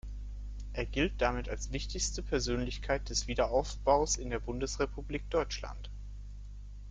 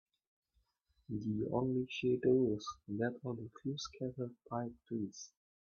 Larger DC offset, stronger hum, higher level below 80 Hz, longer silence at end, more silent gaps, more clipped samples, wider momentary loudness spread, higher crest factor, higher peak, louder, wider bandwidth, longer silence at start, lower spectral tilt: neither; first, 50 Hz at -40 dBFS vs none; first, -40 dBFS vs -70 dBFS; second, 0 s vs 0.5 s; neither; neither; first, 17 LU vs 13 LU; about the same, 22 dB vs 18 dB; first, -12 dBFS vs -20 dBFS; first, -34 LUFS vs -38 LUFS; first, 9.4 kHz vs 7 kHz; second, 0.05 s vs 1.1 s; second, -4 dB/octave vs -6.5 dB/octave